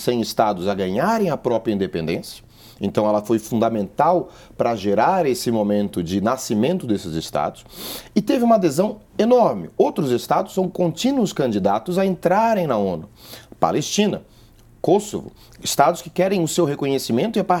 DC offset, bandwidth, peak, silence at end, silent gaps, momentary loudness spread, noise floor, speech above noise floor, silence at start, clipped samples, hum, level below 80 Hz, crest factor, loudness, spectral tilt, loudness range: under 0.1%; 19 kHz; 0 dBFS; 0 s; none; 10 LU; -49 dBFS; 29 dB; 0 s; under 0.1%; none; -54 dBFS; 20 dB; -20 LUFS; -5.5 dB/octave; 3 LU